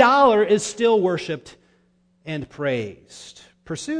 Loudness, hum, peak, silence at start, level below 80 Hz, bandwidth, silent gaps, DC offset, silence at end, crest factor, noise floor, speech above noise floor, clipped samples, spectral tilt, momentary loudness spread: -20 LUFS; none; -2 dBFS; 0 s; -58 dBFS; 10 kHz; none; under 0.1%; 0 s; 20 dB; -62 dBFS; 41 dB; under 0.1%; -4.5 dB/octave; 25 LU